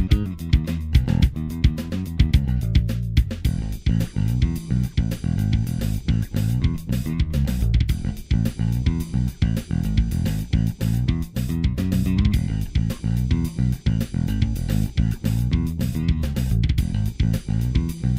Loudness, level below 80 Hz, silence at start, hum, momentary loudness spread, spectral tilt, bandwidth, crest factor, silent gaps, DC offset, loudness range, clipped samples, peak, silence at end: -23 LUFS; -26 dBFS; 0 s; none; 3 LU; -7 dB/octave; 16 kHz; 18 dB; none; under 0.1%; 1 LU; under 0.1%; -4 dBFS; 0 s